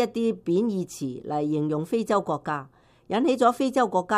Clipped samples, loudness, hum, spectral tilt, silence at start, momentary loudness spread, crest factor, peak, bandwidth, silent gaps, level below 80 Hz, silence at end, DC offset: under 0.1%; -26 LUFS; none; -6 dB/octave; 0 s; 10 LU; 18 dB; -8 dBFS; 15 kHz; none; -64 dBFS; 0 s; under 0.1%